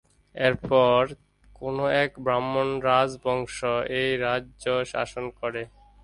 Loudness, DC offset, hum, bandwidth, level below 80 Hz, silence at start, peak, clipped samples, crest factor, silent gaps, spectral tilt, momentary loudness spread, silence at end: -25 LUFS; under 0.1%; 50 Hz at -55 dBFS; 11.5 kHz; -54 dBFS; 0.35 s; -6 dBFS; under 0.1%; 18 dB; none; -5 dB/octave; 11 LU; 0.35 s